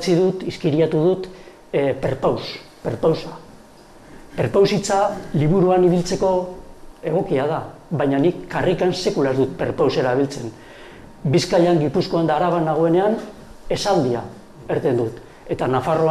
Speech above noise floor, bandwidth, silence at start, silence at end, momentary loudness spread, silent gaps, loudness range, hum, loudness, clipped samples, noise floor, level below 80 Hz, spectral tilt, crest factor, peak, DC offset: 26 dB; 13.5 kHz; 0 s; 0 s; 15 LU; none; 3 LU; none; -20 LUFS; under 0.1%; -45 dBFS; -46 dBFS; -6.5 dB/octave; 14 dB; -6 dBFS; under 0.1%